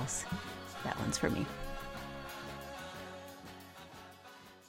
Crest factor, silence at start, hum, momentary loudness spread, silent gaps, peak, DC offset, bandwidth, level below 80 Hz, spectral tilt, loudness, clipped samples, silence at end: 24 dB; 0 s; none; 18 LU; none; -18 dBFS; under 0.1%; 16.5 kHz; -54 dBFS; -4 dB/octave; -40 LUFS; under 0.1%; 0 s